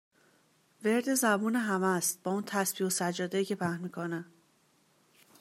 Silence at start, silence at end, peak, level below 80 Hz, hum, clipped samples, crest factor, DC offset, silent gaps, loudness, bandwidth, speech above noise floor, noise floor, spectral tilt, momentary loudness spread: 0.8 s; 1.15 s; -12 dBFS; -82 dBFS; none; under 0.1%; 20 dB; under 0.1%; none; -31 LUFS; 16 kHz; 38 dB; -68 dBFS; -4 dB/octave; 9 LU